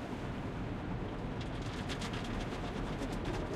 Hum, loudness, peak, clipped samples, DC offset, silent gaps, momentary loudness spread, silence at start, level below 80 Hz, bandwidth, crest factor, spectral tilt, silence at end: none; -40 LUFS; -26 dBFS; under 0.1%; under 0.1%; none; 2 LU; 0 s; -46 dBFS; 14 kHz; 12 dB; -6 dB/octave; 0 s